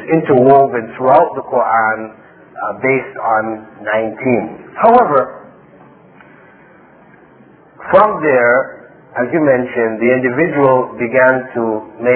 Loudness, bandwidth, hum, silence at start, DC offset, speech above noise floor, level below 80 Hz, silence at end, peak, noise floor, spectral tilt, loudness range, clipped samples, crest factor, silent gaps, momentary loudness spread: -13 LUFS; 4 kHz; none; 0 s; under 0.1%; 31 dB; -54 dBFS; 0 s; 0 dBFS; -44 dBFS; -10.5 dB/octave; 4 LU; 0.2%; 14 dB; none; 14 LU